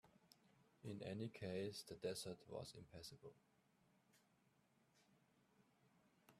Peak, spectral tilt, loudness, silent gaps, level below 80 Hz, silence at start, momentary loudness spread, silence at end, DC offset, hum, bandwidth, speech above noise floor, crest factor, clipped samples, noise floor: -36 dBFS; -5 dB/octave; -52 LUFS; none; -82 dBFS; 0.05 s; 10 LU; 0 s; under 0.1%; none; 14.5 kHz; 28 dB; 20 dB; under 0.1%; -80 dBFS